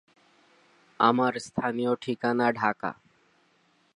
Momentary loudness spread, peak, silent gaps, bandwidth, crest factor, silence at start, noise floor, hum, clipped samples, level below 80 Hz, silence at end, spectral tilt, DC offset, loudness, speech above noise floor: 11 LU; -8 dBFS; none; 11 kHz; 22 dB; 1 s; -66 dBFS; none; under 0.1%; -70 dBFS; 1 s; -5.5 dB/octave; under 0.1%; -27 LUFS; 40 dB